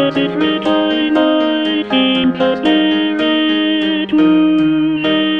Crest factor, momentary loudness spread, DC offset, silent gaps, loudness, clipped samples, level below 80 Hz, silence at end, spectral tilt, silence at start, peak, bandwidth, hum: 12 dB; 3 LU; 0.3%; none; -13 LUFS; under 0.1%; -52 dBFS; 0 s; -6.5 dB/octave; 0 s; 0 dBFS; 5.6 kHz; none